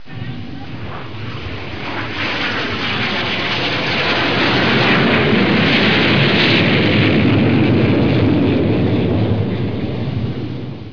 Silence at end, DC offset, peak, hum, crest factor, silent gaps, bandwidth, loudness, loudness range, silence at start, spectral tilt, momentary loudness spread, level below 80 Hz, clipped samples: 0 s; 3%; -2 dBFS; none; 14 dB; none; 5.4 kHz; -15 LUFS; 7 LU; 0.05 s; -7 dB/octave; 16 LU; -40 dBFS; under 0.1%